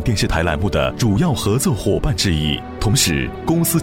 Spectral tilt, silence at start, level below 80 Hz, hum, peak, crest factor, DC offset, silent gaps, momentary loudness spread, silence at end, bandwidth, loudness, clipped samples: -4.5 dB/octave; 0 s; -28 dBFS; none; -2 dBFS; 16 dB; under 0.1%; none; 4 LU; 0 s; 17 kHz; -18 LUFS; under 0.1%